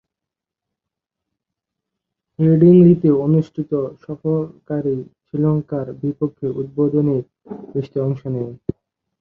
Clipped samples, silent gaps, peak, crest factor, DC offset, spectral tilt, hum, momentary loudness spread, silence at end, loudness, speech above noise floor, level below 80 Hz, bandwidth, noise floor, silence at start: under 0.1%; none; -2 dBFS; 18 dB; under 0.1%; -12.5 dB/octave; none; 16 LU; 0.65 s; -18 LUFS; 68 dB; -56 dBFS; 3.5 kHz; -86 dBFS; 2.4 s